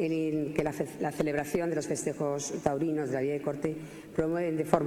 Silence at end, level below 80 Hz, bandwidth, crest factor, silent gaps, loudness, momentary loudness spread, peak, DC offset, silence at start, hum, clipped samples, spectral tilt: 0 s; -58 dBFS; 17.5 kHz; 24 dB; none; -32 LUFS; 4 LU; -6 dBFS; under 0.1%; 0 s; none; under 0.1%; -6 dB/octave